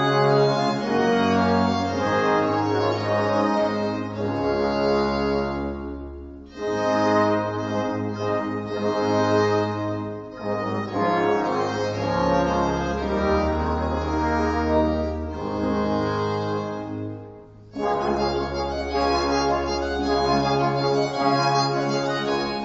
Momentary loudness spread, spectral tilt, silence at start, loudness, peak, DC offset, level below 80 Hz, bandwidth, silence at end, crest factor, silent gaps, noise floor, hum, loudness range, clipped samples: 9 LU; -6 dB/octave; 0 s; -23 LUFS; -6 dBFS; under 0.1%; -40 dBFS; 8 kHz; 0 s; 16 dB; none; -43 dBFS; none; 4 LU; under 0.1%